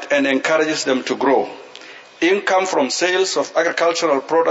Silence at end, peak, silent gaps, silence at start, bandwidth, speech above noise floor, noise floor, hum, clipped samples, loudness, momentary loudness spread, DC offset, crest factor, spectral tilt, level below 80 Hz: 0 s; -4 dBFS; none; 0 s; 8 kHz; 22 dB; -39 dBFS; none; under 0.1%; -17 LUFS; 12 LU; under 0.1%; 14 dB; -2.5 dB/octave; -74 dBFS